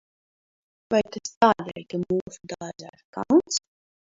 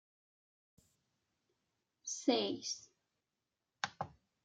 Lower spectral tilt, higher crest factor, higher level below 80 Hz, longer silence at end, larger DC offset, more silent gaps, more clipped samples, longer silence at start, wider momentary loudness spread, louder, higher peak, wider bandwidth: first, -4.5 dB/octave vs -2.5 dB/octave; about the same, 22 dB vs 26 dB; first, -62 dBFS vs -82 dBFS; first, 0.55 s vs 0.35 s; neither; first, 1.37-1.41 s, 2.21-2.26 s, 3.05-3.13 s vs none; neither; second, 0.9 s vs 2.05 s; first, 17 LU vs 14 LU; first, -24 LUFS vs -39 LUFS; first, -4 dBFS vs -18 dBFS; second, 7.8 kHz vs 10 kHz